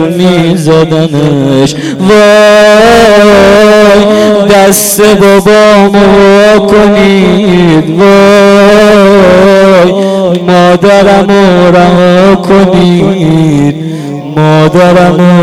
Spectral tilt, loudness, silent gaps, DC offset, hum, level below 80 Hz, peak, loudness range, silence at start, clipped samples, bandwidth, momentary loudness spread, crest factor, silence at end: -5.5 dB/octave; -3 LUFS; none; 0.6%; none; -30 dBFS; 0 dBFS; 2 LU; 0 s; 10%; 16 kHz; 6 LU; 2 dB; 0 s